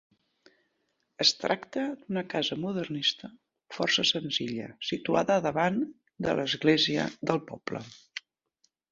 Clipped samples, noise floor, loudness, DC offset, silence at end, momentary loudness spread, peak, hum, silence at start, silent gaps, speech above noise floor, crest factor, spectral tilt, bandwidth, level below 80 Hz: under 0.1%; -77 dBFS; -28 LUFS; under 0.1%; 0.75 s; 15 LU; -8 dBFS; none; 1.2 s; none; 48 dB; 22 dB; -4 dB/octave; 7.8 kHz; -68 dBFS